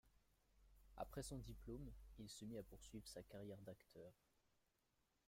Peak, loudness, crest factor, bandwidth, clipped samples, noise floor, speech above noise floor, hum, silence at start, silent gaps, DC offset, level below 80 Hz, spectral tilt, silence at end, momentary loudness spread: -36 dBFS; -57 LUFS; 22 dB; 16.5 kHz; under 0.1%; -86 dBFS; 30 dB; none; 0.05 s; none; under 0.1%; -66 dBFS; -5 dB/octave; 1.15 s; 11 LU